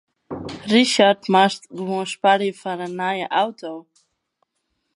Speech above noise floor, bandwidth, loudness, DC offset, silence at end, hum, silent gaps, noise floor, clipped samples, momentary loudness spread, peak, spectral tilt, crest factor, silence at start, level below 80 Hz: 54 dB; 11.5 kHz; -19 LUFS; under 0.1%; 1.15 s; none; none; -74 dBFS; under 0.1%; 18 LU; 0 dBFS; -4 dB/octave; 20 dB; 0.3 s; -62 dBFS